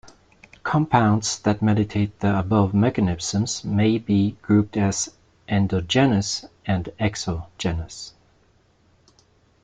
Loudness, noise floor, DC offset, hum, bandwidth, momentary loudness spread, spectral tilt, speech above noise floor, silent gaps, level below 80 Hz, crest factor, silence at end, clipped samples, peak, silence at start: -22 LUFS; -60 dBFS; under 0.1%; none; 9.4 kHz; 10 LU; -5.5 dB/octave; 39 dB; none; -48 dBFS; 20 dB; 1.55 s; under 0.1%; -2 dBFS; 0.05 s